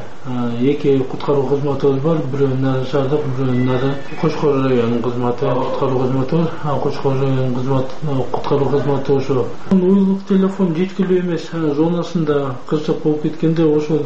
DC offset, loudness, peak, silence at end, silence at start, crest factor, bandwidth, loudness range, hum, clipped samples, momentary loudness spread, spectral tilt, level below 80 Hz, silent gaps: 7%; -18 LUFS; -4 dBFS; 0 s; 0 s; 12 dB; 8 kHz; 2 LU; none; under 0.1%; 5 LU; -8.5 dB/octave; -46 dBFS; none